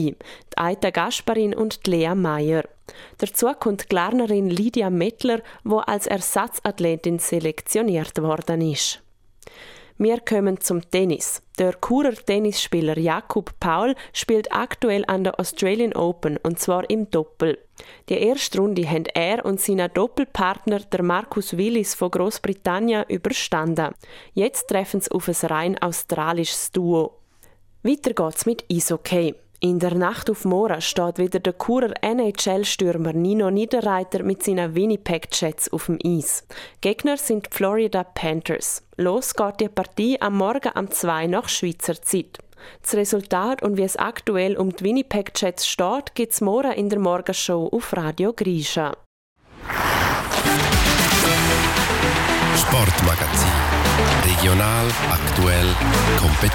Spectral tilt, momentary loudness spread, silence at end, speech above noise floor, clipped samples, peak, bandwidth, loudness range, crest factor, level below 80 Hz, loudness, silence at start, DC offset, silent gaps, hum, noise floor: -4 dB/octave; 7 LU; 0 s; 30 dB; under 0.1%; -2 dBFS; 17.5 kHz; 6 LU; 18 dB; -36 dBFS; -21 LUFS; 0 s; under 0.1%; 49.06-49.36 s; none; -52 dBFS